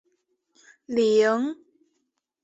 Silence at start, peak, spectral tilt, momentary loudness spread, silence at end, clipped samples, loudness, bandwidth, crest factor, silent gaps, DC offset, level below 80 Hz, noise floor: 0.9 s; -10 dBFS; -4.5 dB/octave; 13 LU; 0.9 s; under 0.1%; -23 LUFS; 8 kHz; 16 dB; none; under 0.1%; -72 dBFS; -77 dBFS